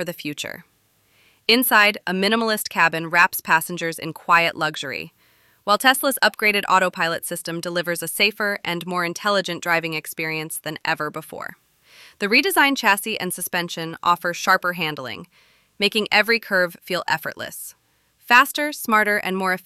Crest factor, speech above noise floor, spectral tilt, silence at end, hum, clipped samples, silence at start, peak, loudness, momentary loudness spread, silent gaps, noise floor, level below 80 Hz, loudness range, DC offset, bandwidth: 20 dB; 40 dB; -2.5 dB/octave; 0.05 s; none; under 0.1%; 0 s; -2 dBFS; -20 LUFS; 14 LU; none; -61 dBFS; -68 dBFS; 4 LU; under 0.1%; 16.5 kHz